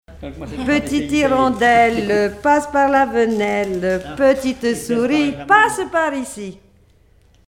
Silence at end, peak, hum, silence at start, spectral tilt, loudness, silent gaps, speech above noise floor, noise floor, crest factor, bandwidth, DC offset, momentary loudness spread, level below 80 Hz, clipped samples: 0.95 s; 0 dBFS; none; 0.1 s; -4.5 dB/octave; -17 LUFS; none; 35 dB; -52 dBFS; 16 dB; 16.5 kHz; under 0.1%; 12 LU; -42 dBFS; under 0.1%